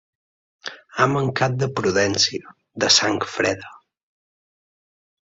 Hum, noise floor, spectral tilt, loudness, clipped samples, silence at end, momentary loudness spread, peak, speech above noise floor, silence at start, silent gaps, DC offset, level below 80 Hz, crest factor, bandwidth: none; under -90 dBFS; -3 dB/octave; -19 LUFS; under 0.1%; 1.55 s; 20 LU; 0 dBFS; over 70 dB; 0.65 s; none; under 0.1%; -56 dBFS; 24 dB; 8 kHz